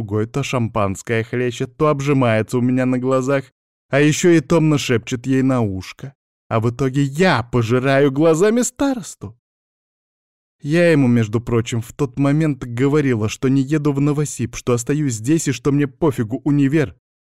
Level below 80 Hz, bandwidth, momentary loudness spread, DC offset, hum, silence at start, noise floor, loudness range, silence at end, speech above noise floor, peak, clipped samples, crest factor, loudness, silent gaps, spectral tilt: -48 dBFS; 15 kHz; 9 LU; 0.3%; none; 0 s; under -90 dBFS; 2 LU; 0.35 s; over 73 dB; -4 dBFS; under 0.1%; 14 dB; -18 LUFS; 3.52-3.89 s, 6.15-6.50 s, 9.39-10.59 s; -6 dB/octave